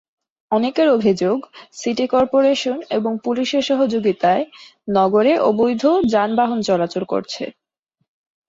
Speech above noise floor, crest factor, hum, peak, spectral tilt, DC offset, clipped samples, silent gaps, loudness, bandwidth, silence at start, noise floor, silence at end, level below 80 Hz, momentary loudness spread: 55 dB; 14 dB; none; -4 dBFS; -5.5 dB/octave; under 0.1%; under 0.1%; none; -18 LUFS; 7.8 kHz; 0.5 s; -73 dBFS; 1 s; -58 dBFS; 10 LU